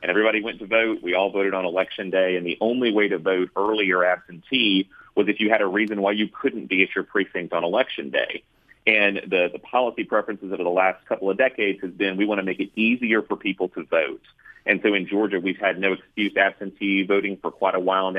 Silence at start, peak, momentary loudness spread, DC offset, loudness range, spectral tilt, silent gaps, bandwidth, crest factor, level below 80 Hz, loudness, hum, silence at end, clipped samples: 0 s; -2 dBFS; 6 LU; under 0.1%; 2 LU; -7 dB/octave; none; 5 kHz; 20 dB; -66 dBFS; -22 LUFS; none; 0 s; under 0.1%